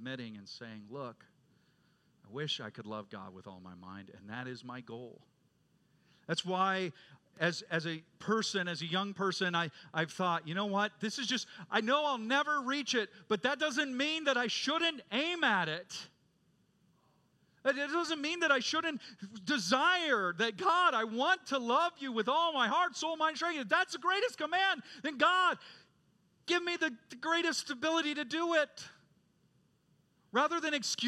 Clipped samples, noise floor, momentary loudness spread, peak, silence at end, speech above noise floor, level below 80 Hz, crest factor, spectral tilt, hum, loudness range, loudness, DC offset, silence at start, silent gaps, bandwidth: under 0.1%; -72 dBFS; 16 LU; -14 dBFS; 0 s; 38 dB; -86 dBFS; 22 dB; -3 dB/octave; none; 13 LU; -33 LUFS; under 0.1%; 0 s; none; 13.5 kHz